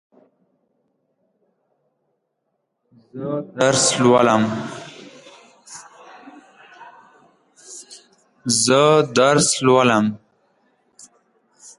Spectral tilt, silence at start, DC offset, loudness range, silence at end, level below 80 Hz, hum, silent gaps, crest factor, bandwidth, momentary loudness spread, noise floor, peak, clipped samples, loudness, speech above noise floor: -3.5 dB/octave; 3.15 s; under 0.1%; 13 LU; 1.65 s; -64 dBFS; none; none; 20 dB; 11.5 kHz; 25 LU; -74 dBFS; -2 dBFS; under 0.1%; -16 LUFS; 58 dB